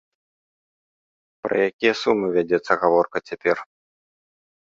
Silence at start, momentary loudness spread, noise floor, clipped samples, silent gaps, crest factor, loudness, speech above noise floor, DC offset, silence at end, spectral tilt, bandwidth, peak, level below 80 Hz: 1.45 s; 7 LU; under -90 dBFS; under 0.1%; 1.73-1.79 s; 22 dB; -21 LUFS; over 69 dB; under 0.1%; 1.05 s; -5.5 dB/octave; 7.6 kHz; -2 dBFS; -64 dBFS